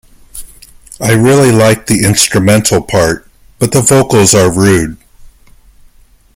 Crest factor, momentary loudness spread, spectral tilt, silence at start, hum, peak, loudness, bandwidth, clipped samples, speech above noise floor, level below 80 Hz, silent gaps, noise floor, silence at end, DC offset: 10 dB; 14 LU; -4.5 dB/octave; 0.35 s; none; 0 dBFS; -8 LUFS; over 20 kHz; under 0.1%; 35 dB; -36 dBFS; none; -43 dBFS; 1.4 s; under 0.1%